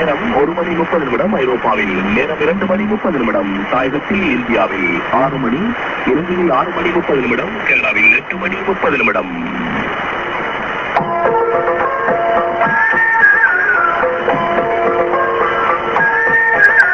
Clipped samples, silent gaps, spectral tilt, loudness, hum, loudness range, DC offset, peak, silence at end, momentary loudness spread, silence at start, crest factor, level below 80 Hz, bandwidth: under 0.1%; none; -6.5 dB/octave; -14 LUFS; none; 4 LU; under 0.1%; 0 dBFS; 0 s; 9 LU; 0 s; 14 dB; -42 dBFS; 8 kHz